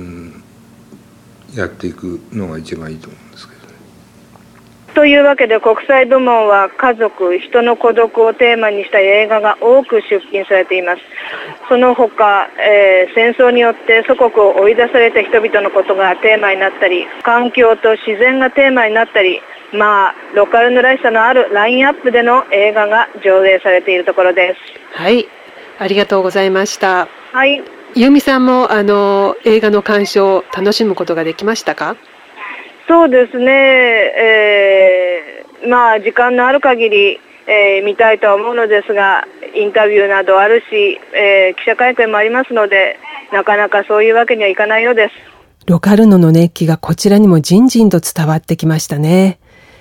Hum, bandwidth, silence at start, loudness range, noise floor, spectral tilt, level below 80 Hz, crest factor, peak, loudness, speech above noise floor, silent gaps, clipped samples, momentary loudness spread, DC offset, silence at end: none; 17 kHz; 0 s; 4 LU; -42 dBFS; -5.5 dB/octave; -52 dBFS; 10 dB; 0 dBFS; -10 LUFS; 32 dB; none; under 0.1%; 10 LU; under 0.1%; 0.45 s